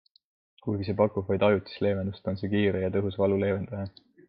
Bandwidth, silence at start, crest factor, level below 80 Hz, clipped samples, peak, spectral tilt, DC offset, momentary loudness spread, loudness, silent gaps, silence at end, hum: 5.2 kHz; 0.65 s; 20 dB; -64 dBFS; under 0.1%; -8 dBFS; -10.5 dB/octave; under 0.1%; 10 LU; -28 LUFS; none; 0.4 s; none